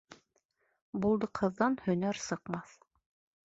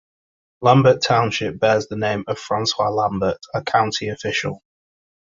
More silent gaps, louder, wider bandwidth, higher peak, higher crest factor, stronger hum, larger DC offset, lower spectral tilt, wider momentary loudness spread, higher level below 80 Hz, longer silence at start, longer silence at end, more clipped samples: first, 0.45-0.49 s, 0.82-0.93 s vs none; second, -33 LUFS vs -19 LUFS; about the same, 8 kHz vs 7.8 kHz; second, -14 dBFS vs -2 dBFS; about the same, 22 dB vs 20 dB; neither; neither; about the same, -6 dB/octave vs -5 dB/octave; about the same, 11 LU vs 10 LU; second, -66 dBFS vs -52 dBFS; second, 0.1 s vs 0.6 s; about the same, 0.85 s vs 0.8 s; neither